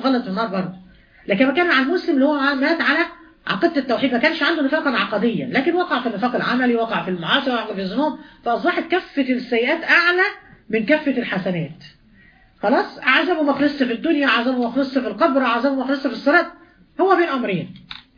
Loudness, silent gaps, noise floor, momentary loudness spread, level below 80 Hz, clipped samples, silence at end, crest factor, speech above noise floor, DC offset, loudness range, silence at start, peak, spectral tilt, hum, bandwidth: -19 LUFS; none; -51 dBFS; 8 LU; -58 dBFS; under 0.1%; 0.2 s; 18 dB; 32 dB; under 0.1%; 2 LU; 0 s; -2 dBFS; -6.5 dB/octave; none; 5.2 kHz